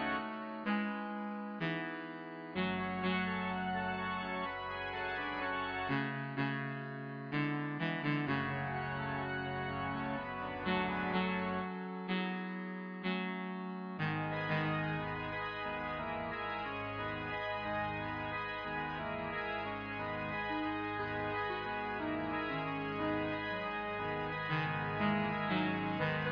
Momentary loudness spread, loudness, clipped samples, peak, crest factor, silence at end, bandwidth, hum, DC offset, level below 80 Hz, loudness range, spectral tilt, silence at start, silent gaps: 6 LU; -38 LUFS; under 0.1%; -22 dBFS; 16 dB; 0 s; 5.4 kHz; none; under 0.1%; -62 dBFS; 2 LU; -4 dB/octave; 0 s; none